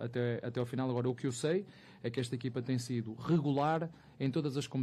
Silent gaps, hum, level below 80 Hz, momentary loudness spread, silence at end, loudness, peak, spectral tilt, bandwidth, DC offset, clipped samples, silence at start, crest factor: none; none; -72 dBFS; 7 LU; 0 s; -36 LUFS; -20 dBFS; -6.5 dB/octave; 13 kHz; under 0.1%; under 0.1%; 0 s; 14 dB